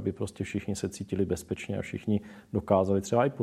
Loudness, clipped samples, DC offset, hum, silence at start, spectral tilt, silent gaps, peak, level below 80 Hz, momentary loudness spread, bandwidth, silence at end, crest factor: -30 LUFS; under 0.1%; under 0.1%; none; 0 s; -6.5 dB/octave; none; -8 dBFS; -56 dBFS; 9 LU; 14 kHz; 0 s; 20 dB